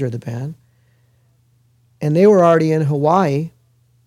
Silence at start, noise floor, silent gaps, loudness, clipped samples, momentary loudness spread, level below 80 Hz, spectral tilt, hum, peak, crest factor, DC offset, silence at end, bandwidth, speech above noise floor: 0 s; -57 dBFS; none; -15 LUFS; under 0.1%; 17 LU; -62 dBFS; -8 dB/octave; none; -2 dBFS; 16 dB; under 0.1%; 0.6 s; 12 kHz; 42 dB